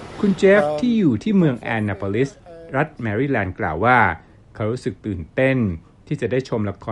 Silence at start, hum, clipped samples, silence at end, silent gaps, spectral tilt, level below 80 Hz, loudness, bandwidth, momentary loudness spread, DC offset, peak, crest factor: 0 s; none; under 0.1%; 0 s; none; -7.5 dB/octave; -46 dBFS; -20 LUFS; 11 kHz; 11 LU; under 0.1%; -2 dBFS; 18 dB